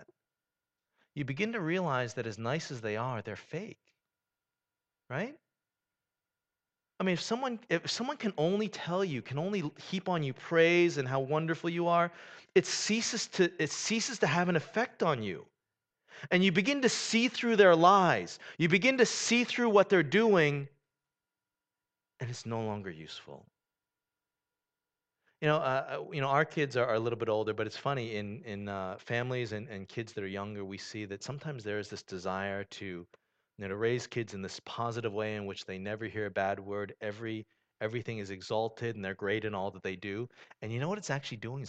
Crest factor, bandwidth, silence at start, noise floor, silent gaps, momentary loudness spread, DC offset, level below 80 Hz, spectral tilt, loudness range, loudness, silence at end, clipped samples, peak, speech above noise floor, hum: 24 dB; 9.2 kHz; 0 s; under -90 dBFS; none; 15 LU; under 0.1%; -74 dBFS; -4.5 dB/octave; 14 LU; -32 LUFS; 0 s; under 0.1%; -10 dBFS; over 58 dB; none